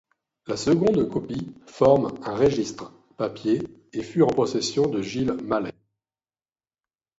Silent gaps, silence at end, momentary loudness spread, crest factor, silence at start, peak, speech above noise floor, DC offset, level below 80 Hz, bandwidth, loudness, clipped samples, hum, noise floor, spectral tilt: none; 1.5 s; 14 LU; 20 dB; 0.45 s; -4 dBFS; over 67 dB; under 0.1%; -54 dBFS; 8 kHz; -24 LUFS; under 0.1%; none; under -90 dBFS; -6 dB/octave